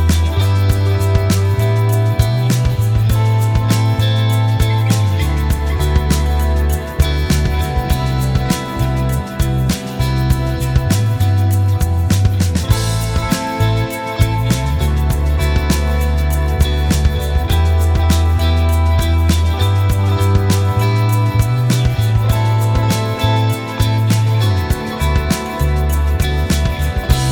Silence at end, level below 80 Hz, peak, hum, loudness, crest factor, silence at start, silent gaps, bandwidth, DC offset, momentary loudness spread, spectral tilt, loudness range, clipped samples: 0 s; -20 dBFS; 0 dBFS; none; -15 LUFS; 14 dB; 0 s; none; 19.5 kHz; under 0.1%; 3 LU; -6 dB/octave; 2 LU; under 0.1%